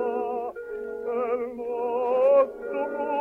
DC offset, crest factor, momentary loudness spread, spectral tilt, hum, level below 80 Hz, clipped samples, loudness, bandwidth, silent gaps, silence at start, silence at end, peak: under 0.1%; 16 dB; 13 LU; -6.5 dB/octave; none; -64 dBFS; under 0.1%; -26 LUFS; 3.3 kHz; none; 0 s; 0 s; -10 dBFS